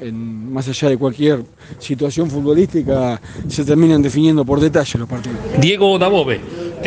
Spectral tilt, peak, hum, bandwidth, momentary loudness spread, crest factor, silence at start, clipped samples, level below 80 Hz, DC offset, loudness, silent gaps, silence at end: -6.5 dB/octave; -2 dBFS; none; 9.4 kHz; 13 LU; 14 dB; 0 s; under 0.1%; -42 dBFS; under 0.1%; -16 LUFS; none; 0 s